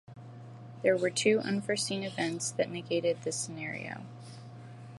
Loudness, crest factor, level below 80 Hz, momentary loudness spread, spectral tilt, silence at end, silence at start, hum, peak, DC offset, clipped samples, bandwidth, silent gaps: -31 LUFS; 22 dB; -74 dBFS; 21 LU; -4 dB/octave; 0 s; 0.1 s; none; -12 dBFS; under 0.1%; under 0.1%; 11.5 kHz; none